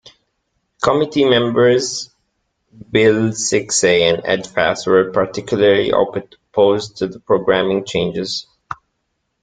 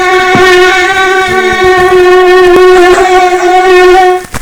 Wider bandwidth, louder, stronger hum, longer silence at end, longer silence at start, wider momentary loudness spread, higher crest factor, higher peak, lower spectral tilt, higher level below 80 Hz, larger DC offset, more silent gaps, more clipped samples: second, 9.4 kHz vs 16.5 kHz; second, -16 LUFS vs -4 LUFS; neither; first, 0.7 s vs 0 s; first, 0.8 s vs 0 s; first, 12 LU vs 4 LU; first, 16 dB vs 4 dB; about the same, 0 dBFS vs 0 dBFS; about the same, -4 dB/octave vs -4 dB/octave; second, -52 dBFS vs -30 dBFS; neither; neither; second, under 0.1% vs 20%